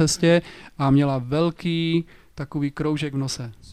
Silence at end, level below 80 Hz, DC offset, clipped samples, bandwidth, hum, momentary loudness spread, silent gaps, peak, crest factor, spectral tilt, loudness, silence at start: 0 s; -48 dBFS; 0.2%; under 0.1%; 13 kHz; none; 13 LU; none; -6 dBFS; 16 dB; -5.5 dB/octave; -23 LUFS; 0 s